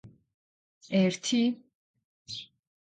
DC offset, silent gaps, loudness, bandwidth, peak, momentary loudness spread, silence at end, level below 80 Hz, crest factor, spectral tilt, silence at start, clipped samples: under 0.1%; 0.34-0.81 s, 1.75-1.94 s, 2.04-2.25 s; -29 LUFS; 9.4 kHz; -14 dBFS; 15 LU; 0.45 s; -74 dBFS; 18 dB; -5 dB/octave; 0.05 s; under 0.1%